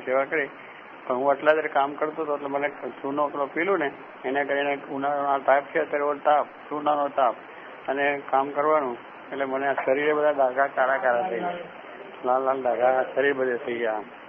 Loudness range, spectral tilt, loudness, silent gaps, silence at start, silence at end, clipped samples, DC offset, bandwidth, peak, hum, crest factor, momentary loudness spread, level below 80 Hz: 2 LU; -8 dB/octave; -25 LUFS; none; 0 s; 0 s; under 0.1%; under 0.1%; 3.6 kHz; -6 dBFS; none; 20 dB; 11 LU; -74 dBFS